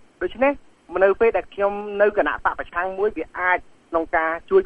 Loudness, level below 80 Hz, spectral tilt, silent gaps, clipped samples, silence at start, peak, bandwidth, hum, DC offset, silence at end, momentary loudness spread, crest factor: -22 LUFS; -48 dBFS; -7 dB/octave; none; under 0.1%; 0.2 s; -4 dBFS; 4.8 kHz; none; under 0.1%; 0 s; 7 LU; 18 dB